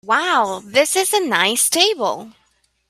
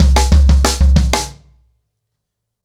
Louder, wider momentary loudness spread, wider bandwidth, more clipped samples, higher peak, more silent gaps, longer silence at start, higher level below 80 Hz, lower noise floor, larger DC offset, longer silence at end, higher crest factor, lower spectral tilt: second, -16 LUFS vs -13 LUFS; about the same, 8 LU vs 8 LU; first, 16 kHz vs 14 kHz; neither; about the same, 0 dBFS vs -2 dBFS; neither; about the same, 0.05 s vs 0 s; second, -66 dBFS vs -14 dBFS; second, -63 dBFS vs -76 dBFS; neither; second, 0.6 s vs 1.3 s; first, 18 dB vs 10 dB; second, -0.5 dB/octave vs -5 dB/octave